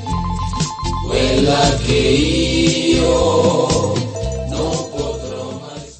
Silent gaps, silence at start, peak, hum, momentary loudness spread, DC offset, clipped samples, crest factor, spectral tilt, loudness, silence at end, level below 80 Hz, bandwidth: none; 0 s; 0 dBFS; none; 10 LU; under 0.1%; under 0.1%; 16 dB; -5 dB/octave; -16 LUFS; 0.05 s; -28 dBFS; 8.8 kHz